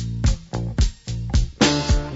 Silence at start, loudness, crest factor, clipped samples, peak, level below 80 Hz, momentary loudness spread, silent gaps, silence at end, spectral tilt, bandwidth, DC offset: 0 s; -22 LUFS; 18 dB; under 0.1%; -2 dBFS; -24 dBFS; 9 LU; none; 0 s; -5 dB/octave; 8 kHz; under 0.1%